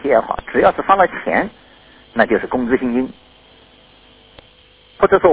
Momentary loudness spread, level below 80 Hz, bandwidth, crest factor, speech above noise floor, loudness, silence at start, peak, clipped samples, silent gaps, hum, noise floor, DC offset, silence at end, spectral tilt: 8 LU; -46 dBFS; 4 kHz; 18 dB; 33 dB; -17 LUFS; 0 s; 0 dBFS; under 0.1%; none; none; -48 dBFS; under 0.1%; 0 s; -9.5 dB/octave